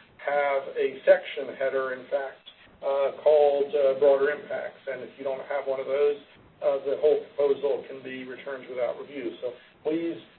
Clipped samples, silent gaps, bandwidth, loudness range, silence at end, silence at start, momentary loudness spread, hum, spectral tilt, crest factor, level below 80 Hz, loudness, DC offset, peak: under 0.1%; none; 4.4 kHz; 4 LU; 0.15 s; 0.2 s; 15 LU; none; -8.5 dB/octave; 20 dB; -72 dBFS; -27 LUFS; under 0.1%; -8 dBFS